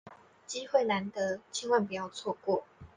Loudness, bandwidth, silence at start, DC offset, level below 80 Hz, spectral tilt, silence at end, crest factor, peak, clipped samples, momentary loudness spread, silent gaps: -32 LUFS; 10 kHz; 0.05 s; under 0.1%; -72 dBFS; -4 dB/octave; 0.1 s; 20 dB; -12 dBFS; under 0.1%; 8 LU; none